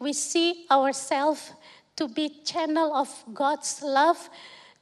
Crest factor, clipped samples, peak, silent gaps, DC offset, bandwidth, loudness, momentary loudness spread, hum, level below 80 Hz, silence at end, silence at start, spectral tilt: 18 dB; under 0.1%; -10 dBFS; none; under 0.1%; 13 kHz; -26 LUFS; 12 LU; none; -82 dBFS; 0.25 s; 0 s; -1 dB/octave